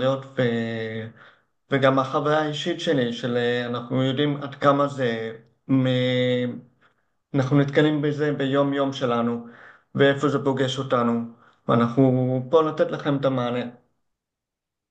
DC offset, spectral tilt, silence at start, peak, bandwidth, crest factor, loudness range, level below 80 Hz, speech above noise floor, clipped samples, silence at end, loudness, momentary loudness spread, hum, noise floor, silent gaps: under 0.1%; -7 dB/octave; 0 s; -4 dBFS; 8.6 kHz; 18 dB; 2 LU; -68 dBFS; 63 dB; under 0.1%; 1.2 s; -23 LUFS; 10 LU; none; -85 dBFS; none